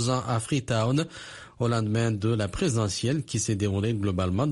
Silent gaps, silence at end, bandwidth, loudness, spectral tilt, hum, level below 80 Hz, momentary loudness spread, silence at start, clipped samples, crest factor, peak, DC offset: none; 0 s; 11.5 kHz; -27 LUFS; -5.5 dB/octave; none; -50 dBFS; 3 LU; 0 s; under 0.1%; 14 dB; -12 dBFS; under 0.1%